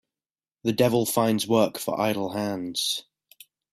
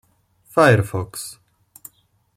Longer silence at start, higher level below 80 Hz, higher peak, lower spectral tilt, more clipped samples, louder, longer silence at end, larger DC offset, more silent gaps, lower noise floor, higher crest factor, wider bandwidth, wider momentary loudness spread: about the same, 0.65 s vs 0.55 s; second, -64 dBFS vs -54 dBFS; second, -6 dBFS vs -2 dBFS; about the same, -4.5 dB/octave vs -5.5 dB/octave; neither; second, -25 LUFS vs -18 LUFS; second, 0.7 s vs 1.05 s; neither; neither; first, under -90 dBFS vs -57 dBFS; about the same, 20 dB vs 20 dB; about the same, 15.5 kHz vs 16.5 kHz; second, 7 LU vs 18 LU